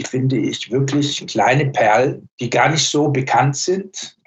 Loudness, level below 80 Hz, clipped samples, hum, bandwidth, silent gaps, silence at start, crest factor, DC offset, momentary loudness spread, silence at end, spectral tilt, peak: -17 LUFS; -60 dBFS; under 0.1%; none; 8.4 kHz; 2.31-2.38 s; 0 s; 16 dB; under 0.1%; 7 LU; 0.2 s; -4.5 dB/octave; -2 dBFS